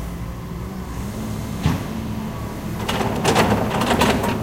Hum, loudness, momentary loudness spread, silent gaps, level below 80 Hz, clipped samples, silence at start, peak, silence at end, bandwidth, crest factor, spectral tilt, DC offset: none; -22 LUFS; 13 LU; none; -34 dBFS; under 0.1%; 0 s; -2 dBFS; 0 s; 17 kHz; 20 dB; -5 dB/octave; under 0.1%